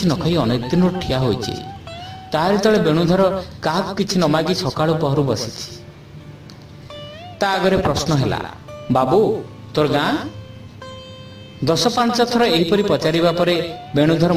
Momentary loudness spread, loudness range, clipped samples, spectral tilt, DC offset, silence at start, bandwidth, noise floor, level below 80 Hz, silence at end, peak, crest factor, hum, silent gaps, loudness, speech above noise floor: 21 LU; 4 LU; under 0.1%; -5.5 dB/octave; under 0.1%; 0 s; 16 kHz; -38 dBFS; -42 dBFS; 0 s; -4 dBFS; 16 dB; none; none; -18 LUFS; 21 dB